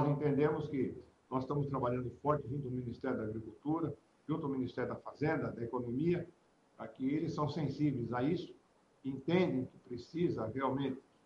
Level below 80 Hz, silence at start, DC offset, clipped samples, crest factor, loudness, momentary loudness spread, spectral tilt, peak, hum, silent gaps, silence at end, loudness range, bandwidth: -66 dBFS; 0 s; under 0.1%; under 0.1%; 20 dB; -37 LUFS; 11 LU; -9 dB/octave; -18 dBFS; none; none; 0.25 s; 2 LU; 7.4 kHz